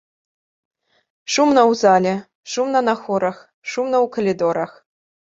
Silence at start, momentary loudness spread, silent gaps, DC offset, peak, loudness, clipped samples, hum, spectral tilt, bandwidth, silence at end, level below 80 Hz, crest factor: 1.3 s; 14 LU; 2.35-2.43 s, 3.54-3.62 s; under 0.1%; -2 dBFS; -18 LUFS; under 0.1%; none; -4.5 dB/octave; 8 kHz; 0.75 s; -64 dBFS; 18 dB